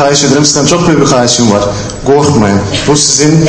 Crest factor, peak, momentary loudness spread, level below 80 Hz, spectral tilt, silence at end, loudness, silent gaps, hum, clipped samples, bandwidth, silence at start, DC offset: 8 dB; 0 dBFS; 5 LU; -32 dBFS; -4 dB/octave; 0 s; -7 LUFS; none; none; 1%; 11 kHz; 0 s; under 0.1%